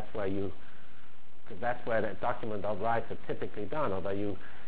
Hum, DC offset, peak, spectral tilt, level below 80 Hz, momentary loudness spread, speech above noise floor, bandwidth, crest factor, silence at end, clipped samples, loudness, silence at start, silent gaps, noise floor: none; 4%; -18 dBFS; -9.5 dB/octave; -58 dBFS; 8 LU; 25 dB; 4 kHz; 18 dB; 0 s; under 0.1%; -35 LUFS; 0 s; none; -59 dBFS